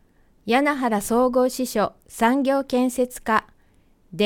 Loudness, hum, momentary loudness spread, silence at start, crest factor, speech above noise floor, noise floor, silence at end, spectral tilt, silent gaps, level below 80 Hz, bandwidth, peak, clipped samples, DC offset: -22 LUFS; none; 6 LU; 0.45 s; 18 dB; 36 dB; -57 dBFS; 0 s; -4.5 dB/octave; none; -52 dBFS; 18 kHz; -6 dBFS; under 0.1%; under 0.1%